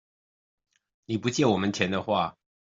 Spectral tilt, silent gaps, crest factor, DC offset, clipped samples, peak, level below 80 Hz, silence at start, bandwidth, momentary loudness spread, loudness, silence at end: -5 dB/octave; none; 22 dB; under 0.1%; under 0.1%; -8 dBFS; -66 dBFS; 1.1 s; 7.8 kHz; 8 LU; -27 LUFS; 0.4 s